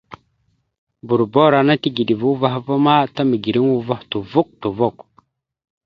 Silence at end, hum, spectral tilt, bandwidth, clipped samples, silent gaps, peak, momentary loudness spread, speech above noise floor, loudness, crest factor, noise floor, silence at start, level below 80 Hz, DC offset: 0.95 s; none; -8.5 dB/octave; 6 kHz; under 0.1%; 0.78-0.87 s; 0 dBFS; 8 LU; 49 dB; -17 LUFS; 18 dB; -66 dBFS; 0.1 s; -58 dBFS; under 0.1%